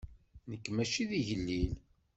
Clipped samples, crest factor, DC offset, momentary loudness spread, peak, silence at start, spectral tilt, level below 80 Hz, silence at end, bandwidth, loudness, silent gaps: under 0.1%; 16 dB; under 0.1%; 16 LU; -20 dBFS; 0 s; -5 dB/octave; -48 dBFS; 0.4 s; 8.2 kHz; -35 LUFS; none